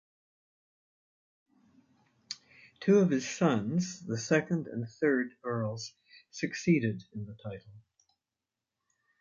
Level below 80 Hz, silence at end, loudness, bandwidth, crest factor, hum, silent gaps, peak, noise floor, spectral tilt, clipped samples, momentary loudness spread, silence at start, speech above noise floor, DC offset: -70 dBFS; 1.4 s; -31 LUFS; 7.6 kHz; 20 dB; none; none; -14 dBFS; -90 dBFS; -6 dB/octave; under 0.1%; 18 LU; 2.3 s; 59 dB; under 0.1%